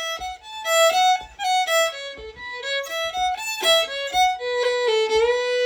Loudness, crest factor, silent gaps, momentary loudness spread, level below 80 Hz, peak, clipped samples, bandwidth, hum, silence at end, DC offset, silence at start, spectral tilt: -21 LUFS; 16 dB; none; 13 LU; -54 dBFS; -6 dBFS; under 0.1%; over 20 kHz; none; 0 s; under 0.1%; 0 s; 0.5 dB/octave